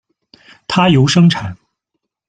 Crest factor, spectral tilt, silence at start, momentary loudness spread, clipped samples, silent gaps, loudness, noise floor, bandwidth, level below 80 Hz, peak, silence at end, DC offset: 14 dB; -6 dB/octave; 0.7 s; 18 LU; under 0.1%; none; -12 LUFS; -75 dBFS; 9.2 kHz; -48 dBFS; -2 dBFS; 0.75 s; under 0.1%